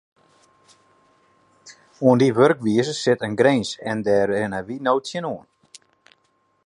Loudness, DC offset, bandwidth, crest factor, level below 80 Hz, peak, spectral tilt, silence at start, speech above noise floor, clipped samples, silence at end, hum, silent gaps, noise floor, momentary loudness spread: -20 LUFS; under 0.1%; 11 kHz; 20 dB; -62 dBFS; -2 dBFS; -5.5 dB/octave; 1.65 s; 46 dB; under 0.1%; 1.25 s; none; none; -66 dBFS; 11 LU